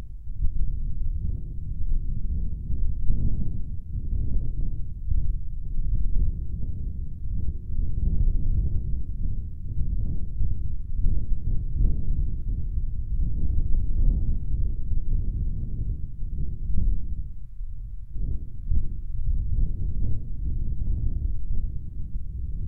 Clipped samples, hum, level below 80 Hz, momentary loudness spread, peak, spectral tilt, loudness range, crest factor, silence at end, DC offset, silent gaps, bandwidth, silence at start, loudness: under 0.1%; none; -26 dBFS; 8 LU; -8 dBFS; -13 dB/octave; 3 LU; 14 dB; 0 s; under 0.1%; none; 0.7 kHz; 0 s; -32 LUFS